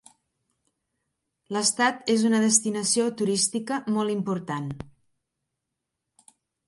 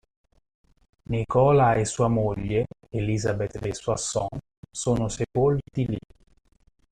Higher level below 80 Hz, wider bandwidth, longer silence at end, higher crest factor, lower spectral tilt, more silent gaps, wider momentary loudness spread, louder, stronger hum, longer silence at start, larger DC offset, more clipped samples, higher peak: second, -64 dBFS vs -46 dBFS; about the same, 11.5 kHz vs 11 kHz; first, 1.8 s vs 0.9 s; about the same, 22 dB vs 18 dB; second, -3 dB/octave vs -6 dB/octave; second, none vs 4.57-4.63 s; about the same, 12 LU vs 11 LU; about the same, -24 LUFS vs -25 LUFS; neither; first, 1.5 s vs 1.1 s; neither; neither; about the same, -6 dBFS vs -8 dBFS